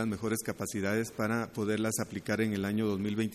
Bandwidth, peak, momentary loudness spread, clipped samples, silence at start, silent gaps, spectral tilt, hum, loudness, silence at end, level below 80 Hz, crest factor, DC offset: 14.5 kHz; -16 dBFS; 3 LU; under 0.1%; 0 s; none; -5 dB/octave; none; -32 LUFS; 0 s; -64 dBFS; 16 dB; under 0.1%